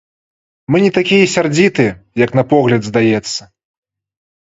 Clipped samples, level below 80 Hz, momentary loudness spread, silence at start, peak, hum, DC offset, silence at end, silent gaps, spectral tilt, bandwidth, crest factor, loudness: under 0.1%; -50 dBFS; 6 LU; 0.7 s; 0 dBFS; none; under 0.1%; 0.95 s; none; -5.5 dB/octave; 8 kHz; 14 dB; -13 LUFS